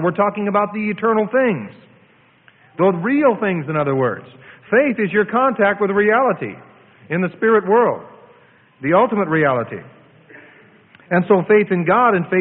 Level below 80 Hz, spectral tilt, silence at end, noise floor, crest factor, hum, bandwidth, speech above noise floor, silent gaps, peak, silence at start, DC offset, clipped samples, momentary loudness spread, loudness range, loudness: -60 dBFS; -12 dB/octave; 0 s; -53 dBFS; 16 dB; none; 4.1 kHz; 36 dB; none; -2 dBFS; 0 s; under 0.1%; under 0.1%; 11 LU; 3 LU; -17 LUFS